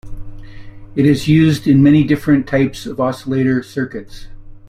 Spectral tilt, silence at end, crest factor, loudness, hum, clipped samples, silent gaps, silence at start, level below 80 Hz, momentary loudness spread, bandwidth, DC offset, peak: -7.5 dB/octave; 0.1 s; 14 dB; -14 LUFS; none; under 0.1%; none; 0.05 s; -36 dBFS; 12 LU; 14.5 kHz; under 0.1%; -2 dBFS